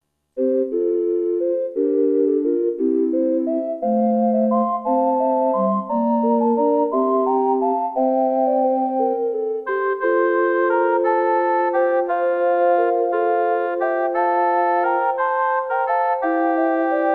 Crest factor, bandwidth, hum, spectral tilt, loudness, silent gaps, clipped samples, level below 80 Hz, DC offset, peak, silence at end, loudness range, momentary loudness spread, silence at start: 12 dB; 4.2 kHz; none; -9.5 dB/octave; -19 LUFS; none; under 0.1%; -70 dBFS; under 0.1%; -6 dBFS; 0 s; 1 LU; 3 LU; 0.35 s